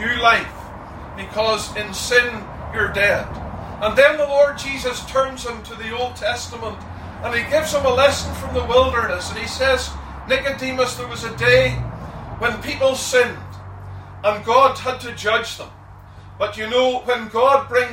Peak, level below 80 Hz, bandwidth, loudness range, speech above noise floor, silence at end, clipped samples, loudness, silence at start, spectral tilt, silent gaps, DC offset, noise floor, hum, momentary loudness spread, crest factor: 0 dBFS; -40 dBFS; 16.5 kHz; 3 LU; 21 dB; 0 s; under 0.1%; -19 LUFS; 0 s; -3.5 dB/octave; none; under 0.1%; -40 dBFS; none; 17 LU; 20 dB